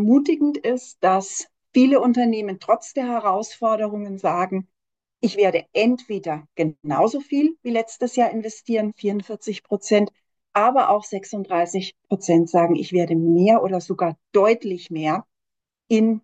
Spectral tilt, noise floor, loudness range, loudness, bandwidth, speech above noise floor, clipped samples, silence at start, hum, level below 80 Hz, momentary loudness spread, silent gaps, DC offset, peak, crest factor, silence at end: -6 dB/octave; -85 dBFS; 4 LU; -21 LUFS; 9 kHz; 65 dB; under 0.1%; 0 s; none; -72 dBFS; 10 LU; none; under 0.1%; -4 dBFS; 16 dB; 0.05 s